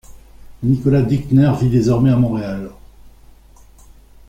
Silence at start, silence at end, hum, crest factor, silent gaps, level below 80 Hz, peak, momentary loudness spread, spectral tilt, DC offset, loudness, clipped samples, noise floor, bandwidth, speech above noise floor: 0.1 s; 1.2 s; none; 16 dB; none; -40 dBFS; -2 dBFS; 12 LU; -9 dB/octave; under 0.1%; -16 LUFS; under 0.1%; -44 dBFS; 9 kHz; 30 dB